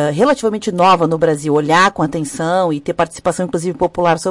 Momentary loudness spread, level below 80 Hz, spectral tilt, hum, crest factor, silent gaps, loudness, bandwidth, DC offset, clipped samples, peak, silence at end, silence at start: 7 LU; -48 dBFS; -5 dB/octave; none; 12 dB; none; -15 LUFS; 11.5 kHz; under 0.1%; under 0.1%; -4 dBFS; 0 s; 0 s